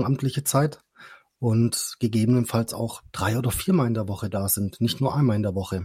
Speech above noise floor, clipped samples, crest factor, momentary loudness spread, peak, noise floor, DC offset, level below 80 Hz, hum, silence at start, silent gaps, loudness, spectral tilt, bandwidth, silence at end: 26 dB; under 0.1%; 18 dB; 7 LU; -6 dBFS; -50 dBFS; under 0.1%; -52 dBFS; none; 0 s; none; -24 LUFS; -5.5 dB/octave; 16.5 kHz; 0 s